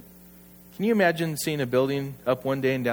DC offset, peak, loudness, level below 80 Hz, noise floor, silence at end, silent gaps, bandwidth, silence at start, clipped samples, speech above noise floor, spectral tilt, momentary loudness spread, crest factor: under 0.1%; -8 dBFS; -25 LUFS; -62 dBFS; -50 dBFS; 0 s; none; over 20 kHz; 0.2 s; under 0.1%; 25 dB; -5.5 dB/octave; 7 LU; 18 dB